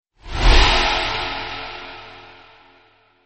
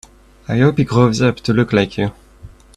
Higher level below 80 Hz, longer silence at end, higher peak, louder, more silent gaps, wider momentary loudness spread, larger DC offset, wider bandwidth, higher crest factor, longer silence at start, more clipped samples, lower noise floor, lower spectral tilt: first, -22 dBFS vs -42 dBFS; first, 1.05 s vs 0.3 s; about the same, 0 dBFS vs 0 dBFS; about the same, -18 LUFS vs -16 LUFS; neither; first, 21 LU vs 9 LU; neither; second, 8.4 kHz vs 11 kHz; about the same, 20 dB vs 16 dB; second, 0.25 s vs 0.5 s; neither; first, -55 dBFS vs -40 dBFS; second, -3.5 dB/octave vs -7 dB/octave